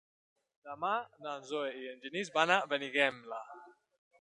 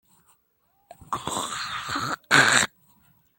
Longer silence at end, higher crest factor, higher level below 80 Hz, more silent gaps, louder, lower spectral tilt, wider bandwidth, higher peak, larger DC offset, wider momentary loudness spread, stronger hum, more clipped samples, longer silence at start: second, 0.5 s vs 0.7 s; about the same, 26 dB vs 26 dB; second, -86 dBFS vs -62 dBFS; neither; second, -34 LUFS vs -23 LUFS; first, -3 dB/octave vs -1.5 dB/octave; second, 11 kHz vs 17 kHz; second, -12 dBFS vs 0 dBFS; neither; about the same, 16 LU vs 14 LU; neither; neither; second, 0.65 s vs 1 s